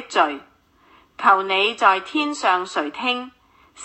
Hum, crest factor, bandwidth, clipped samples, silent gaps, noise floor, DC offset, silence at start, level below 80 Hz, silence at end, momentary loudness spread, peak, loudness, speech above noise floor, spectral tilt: none; 22 dB; 8.6 kHz; under 0.1%; none; -55 dBFS; under 0.1%; 0 s; -68 dBFS; 0 s; 10 LU; 0 dBFS; -20 LUFS; 35 dB; -2 dB/octave